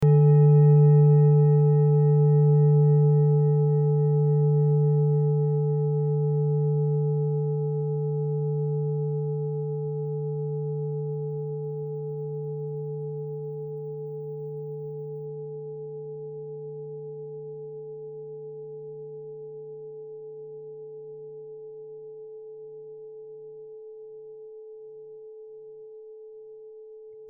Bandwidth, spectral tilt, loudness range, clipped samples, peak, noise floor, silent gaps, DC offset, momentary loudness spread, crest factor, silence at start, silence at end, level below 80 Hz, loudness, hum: 2 kHz; -14 dB/octave; 23 LU; under 0.1%; -10 dBFS; -45 dBFS; none; under 0.1%; 24 LU; 14 dB; 0 s; 0 s; -68 dBFS; -23 LUFS; none